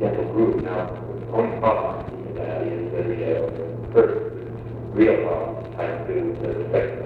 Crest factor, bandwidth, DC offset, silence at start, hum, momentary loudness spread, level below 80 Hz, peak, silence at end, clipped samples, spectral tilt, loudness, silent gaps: 18 dB; 4.8 kHz; under 0.1%; 0 s; none; 12 LU; -46 dBFS; -4 dBFS; 0 s; under 0.1%; -10 dB/octave; -24 LUFS; none